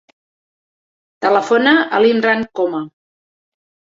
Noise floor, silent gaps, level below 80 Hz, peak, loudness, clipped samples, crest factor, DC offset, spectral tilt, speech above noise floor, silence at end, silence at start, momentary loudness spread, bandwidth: under -90 dBFS; none; -62 dBFS; 0 dBFS; -15 LUFS; under 0.1%; 16 dB; under 0.1%; -5 dB/octave; over 76 dB; 1.1 s; 1.2 s; 9 LU; 7.8 kHz